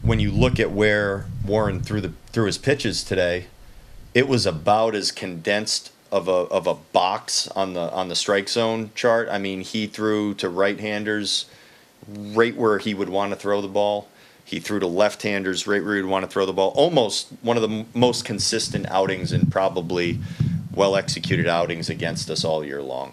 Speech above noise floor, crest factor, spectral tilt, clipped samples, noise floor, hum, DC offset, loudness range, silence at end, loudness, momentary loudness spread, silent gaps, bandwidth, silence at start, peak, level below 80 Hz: 20 dB; 22 dB; -4.5 dB/octave; under 0.1%; -43 dBFS; none; under 0.1%; 2 LU; 0 s; -22 LUFS; 7 LU; none; 14.5 kHz; 0 s; 0 dBFS; -44 dBFS